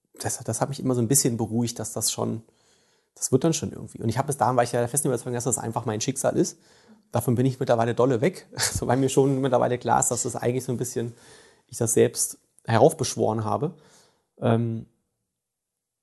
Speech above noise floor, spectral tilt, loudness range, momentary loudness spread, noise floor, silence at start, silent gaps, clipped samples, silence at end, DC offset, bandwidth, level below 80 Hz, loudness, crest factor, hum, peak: 60 dB; -5 dB/octave; 3 LU; 10 LU; -84 dBFS; 0.2 s; none; under 0.1%; 1.2 s; under 0.1%; 12.5 kHz; -54 dBFS; -24 LUFS; 22 dB; none; -4 dBFS